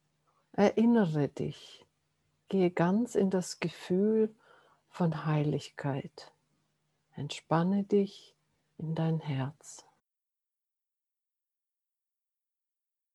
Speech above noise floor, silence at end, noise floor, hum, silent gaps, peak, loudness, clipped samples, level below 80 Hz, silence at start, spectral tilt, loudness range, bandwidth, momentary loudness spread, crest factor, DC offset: 59 dB; 3.35 s; -89 dBFS; none; none; -12 dBFS; -31 LUFS; under 0.1%; -74 dBFS; 0.55 s; -7 dB/octave; 9 LU; 12 kHz; 13 LU; 20 dB; under 0.1%